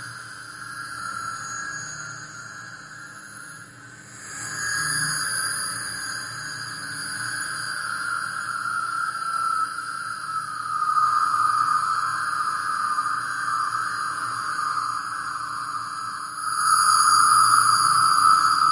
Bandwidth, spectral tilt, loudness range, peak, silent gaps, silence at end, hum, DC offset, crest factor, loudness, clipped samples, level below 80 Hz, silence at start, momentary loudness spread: 11.5 kHz; 0 dB/octave; 14 LU; -4 dBFS; none; 0 s; none; under 0.1%; 20 dB; -23 LUFS; under 0.1%; -66 dBFS; 0 s; 20 LU